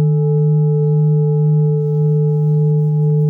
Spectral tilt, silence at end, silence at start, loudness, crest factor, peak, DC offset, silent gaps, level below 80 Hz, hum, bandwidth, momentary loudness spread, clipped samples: -14.5 dB/octave; 0 s; 0 s; -15 LUFS; 6 dB; -8 dBFS; under 0.1%; none; -64 dBFS; none; 1.4 kHz; 1 LU; under 0.1%